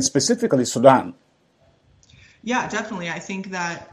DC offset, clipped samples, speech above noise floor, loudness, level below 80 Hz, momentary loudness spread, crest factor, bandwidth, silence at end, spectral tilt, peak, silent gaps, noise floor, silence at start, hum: under 0.1%; under 0.1%; 39 dB; -20 LUFS; -62 dBFS; 14 LU; 22 dB; 14.5 kHz; 0.1 s; -4 dB/octave; 0 dBFS; none; -60 dBFS; 0 s; none